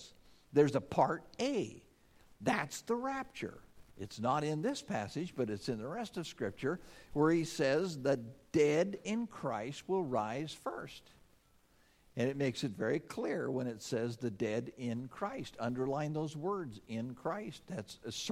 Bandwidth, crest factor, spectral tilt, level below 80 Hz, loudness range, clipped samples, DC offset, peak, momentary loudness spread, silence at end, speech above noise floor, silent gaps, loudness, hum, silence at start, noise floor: 15.5 kHz; 22 dB; -5.5 dB/octave; -68 dBFS; 5 LU; under 0.1%; under 0.1%; -16 dBFS; 12 LU; 0 s; 32 dB; none; -37 LUFS; none; 0 s; -68 dBFS